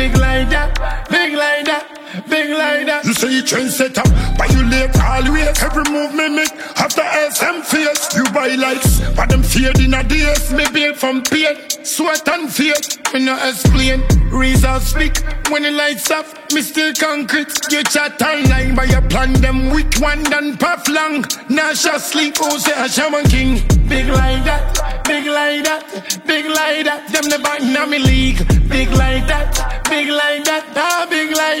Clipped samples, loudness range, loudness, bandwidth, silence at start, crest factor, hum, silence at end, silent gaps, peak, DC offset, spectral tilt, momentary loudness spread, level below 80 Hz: under 0.1%; 2 LU; -15 LUFS; 16.5 kHz; 0 s; 14 dB; none; 0 s; none; 0 dBFS; under 0.1%; -4 dB/octave; 4 LU; -20 dBFS